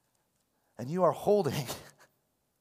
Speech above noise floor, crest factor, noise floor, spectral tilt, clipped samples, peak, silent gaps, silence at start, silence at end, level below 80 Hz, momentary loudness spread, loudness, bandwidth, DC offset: 47 dB; 20 dB; -76 dBFS; -6 dB/octave; under 0.1%; -14 dBFS; none; 0.8 s; 0.75 s; -70 dBFS; 16 LU; -30 LUFS; 16 kHz; under 0.1%